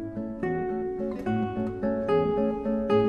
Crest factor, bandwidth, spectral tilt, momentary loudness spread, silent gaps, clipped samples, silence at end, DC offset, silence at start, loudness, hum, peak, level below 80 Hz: 14 dB; 6.6 kHz; -9 dB/octave; 6 LU; none; under 0.1%; 0 s; under 0.1%; 0 s; -28 LUFS; none; -12 dBFS; -50 dBFS